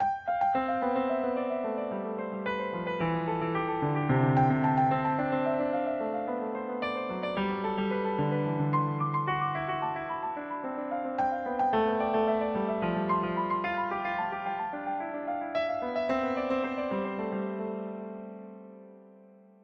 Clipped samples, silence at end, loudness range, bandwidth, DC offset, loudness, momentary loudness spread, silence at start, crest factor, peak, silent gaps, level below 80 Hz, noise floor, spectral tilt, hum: under 0.1%; 0.35 s; 4 LU; 6.6 kHz; under 0.1%; -30 LUFS; 8 LU; 0 s; 16 dB; -14 dBFS; none; -62 dBFS; -55 dBFS; -9 dB/octave; none